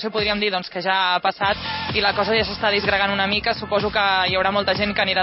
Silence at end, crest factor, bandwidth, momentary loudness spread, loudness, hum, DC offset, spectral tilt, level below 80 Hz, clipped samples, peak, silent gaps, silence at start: 0 s; 18 dB; 6 kHz; 4 LU; -20 LUFS; none; under 0.1%; -7.5 dB/octave; -44 dBFS; under 0.1%; -2 dBFS; none; 0 s